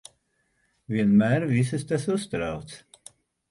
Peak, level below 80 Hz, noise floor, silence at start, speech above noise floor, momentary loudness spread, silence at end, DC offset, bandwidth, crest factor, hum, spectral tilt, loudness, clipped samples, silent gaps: -10 dBFS; -56 dBFS; -71 dBFS; 0.9 s; 48 dB; 17 LU; 0.75 s; under 0.1%; 11.5 kHz; 16 dB; none; -7 dB/octave; -25 LUFS; under 0.1%; none